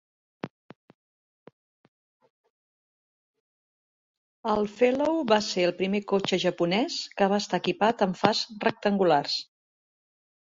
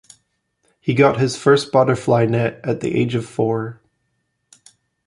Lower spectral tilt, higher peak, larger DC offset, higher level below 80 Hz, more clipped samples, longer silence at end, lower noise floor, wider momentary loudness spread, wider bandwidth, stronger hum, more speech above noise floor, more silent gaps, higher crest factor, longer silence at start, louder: second, -5 dB/octave vs -6.5 dB/octave; about the same, -2 dBFS vs 0 dBFS; neither; second, -68 dBFS vs -54 dBFS; neither; second, 1.1 s vs 1.35 s; first, under -90 dBFS vs -71 dBFS; about the same, 8 LU vs 8 LU; second, 7.8 kHz vs 11.5 kHz; neither; first, over 65 dB vs 54 dB; first, 0.50-0.69 s, 0.76-0.88 s, 0.95-1.46 s, 1.53-2.20 s, 2.30-2.44 s, 2.50-3.34 s, 3.40-4.43 s vs none; first, 26 dB vs 18 dB; second, 0.45 s vs 0.85 s; second, -26 LUFS vs -18 LUFS